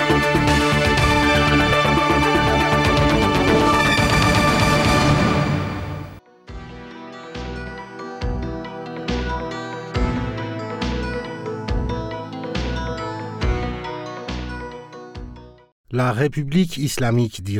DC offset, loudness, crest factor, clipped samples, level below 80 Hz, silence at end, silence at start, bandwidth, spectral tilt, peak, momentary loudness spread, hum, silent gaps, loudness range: under 0.1%; -19 LUFS; 14 dB; under 0.1%; -32 dBFS; 0 s; 0 s; 16.5 kHz; -5.5 dB/octave; -6 dBFS; 18 LU; none; 15.72-15.84 s; 13 LU